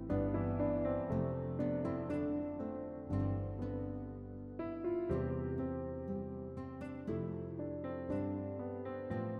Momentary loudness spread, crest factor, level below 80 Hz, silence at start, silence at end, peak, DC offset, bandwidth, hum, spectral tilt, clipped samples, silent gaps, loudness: 9 LU; 16 dB; -54 dBFS; 0 s; 0 s; -22 dBFS; under 0.1%; 5 kHz; none; -11 dB/octave; under 0.1%; none; -40 LUFS